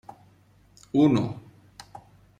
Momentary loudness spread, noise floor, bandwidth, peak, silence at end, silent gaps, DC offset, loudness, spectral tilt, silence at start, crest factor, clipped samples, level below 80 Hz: 25 LU; -58 dBFS; 9.6 kHz; -8 dBFS; 0.4 s; none; under 0.1%; -24 LUFS; -8 dB/octave; 0.95 s; 20 dB; under 0.1%; -60 dBFS